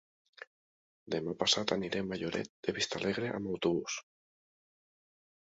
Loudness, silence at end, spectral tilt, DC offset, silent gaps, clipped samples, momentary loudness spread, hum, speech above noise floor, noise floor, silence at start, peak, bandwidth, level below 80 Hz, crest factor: -34 LUFS; 1.5 s; -3 dB/octave; under 0.1%; 0.47-1.06 s, 2.50-2.63 s; under 0.1%; 18 LU; none; over 56 dB; under -90 dBFS; 0.4 s; -14 dBFS; 7.6 kHz; -68 dBFS; 24 dB